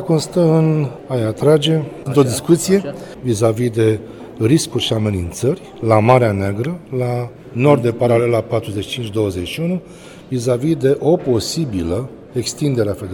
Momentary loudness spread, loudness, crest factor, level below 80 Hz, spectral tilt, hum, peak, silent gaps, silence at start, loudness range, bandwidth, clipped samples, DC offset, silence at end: 10 LU; -17 LUFS; 16 dB; -46 dBFS; -6 dB/octave; none; 0 dBFS; none; 0 s; 3 LU; 18.5 kHz; under 0.1%; under 0.1%; 0 s